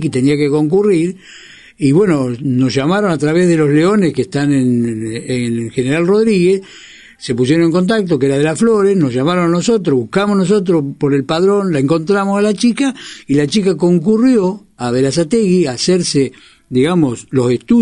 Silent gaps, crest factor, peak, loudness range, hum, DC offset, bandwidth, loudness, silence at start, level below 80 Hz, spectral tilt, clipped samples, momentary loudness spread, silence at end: none; 12 dB; 0 dBFS; 2 LU; none; under 0.1%; 11 kHz; -14 LUFS; 0 s; -48 dBFS; -6.5 dB/octave; under 0.1%; 7 LU; 0 s